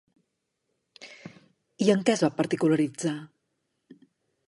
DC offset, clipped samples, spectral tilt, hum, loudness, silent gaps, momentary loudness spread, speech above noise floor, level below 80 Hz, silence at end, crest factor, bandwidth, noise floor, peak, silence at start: under 0.1%; under 0.1%; -5.5 dB/octave; none; -25 LUFS; none; 23 LU; 55 dB; -78 dBFS; 1.25 s; 20 dB; 11.5 kHz; -79 dBFS; -8 dBFS; 1 s